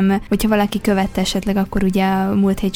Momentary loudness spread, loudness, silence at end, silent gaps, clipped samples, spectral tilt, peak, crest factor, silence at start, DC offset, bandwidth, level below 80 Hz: 3 LU; -18 LUFS; 0 s; none; under 0.1%; -6 dB/octave; -4 dBFS; 14 dB; 0 s; under 0.1%; 17 kHz; -34 dBFS